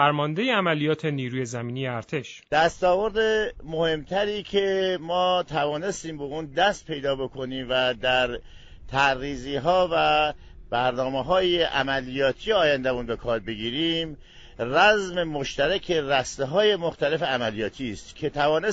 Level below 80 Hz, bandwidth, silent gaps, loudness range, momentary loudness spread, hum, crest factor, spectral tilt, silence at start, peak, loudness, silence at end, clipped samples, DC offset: -48 dBFS; 8.8 kHz; none; 2 LU; 9 LU; none; 20 dB; -4.5 dB/octave; 0 s; -6 dBFS; -24 LUFS; 0 s; under 0.1%; under 0.1%